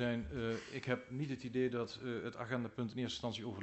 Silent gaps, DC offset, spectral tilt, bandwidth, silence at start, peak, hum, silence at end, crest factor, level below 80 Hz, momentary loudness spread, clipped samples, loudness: none; under 0.1%; -6 dB/octave; 8.2 kHz; 0 s; -20 dBFS; none; 0 s; 20 dB; -62 dBFS; 5 LU; under 0.1%; -41 LUFS